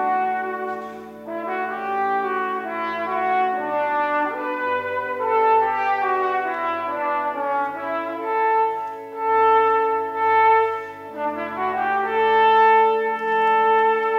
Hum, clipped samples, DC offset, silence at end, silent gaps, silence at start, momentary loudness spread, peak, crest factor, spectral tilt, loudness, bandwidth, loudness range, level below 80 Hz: none; under 0.1%; under 0.1%; 0 s; none; 0 s; 11 LU; -8 dBFS; 14 dB; -5 dB/octave; -21 LUFS; 6.6 kHz; 5 LU; -70 dBFS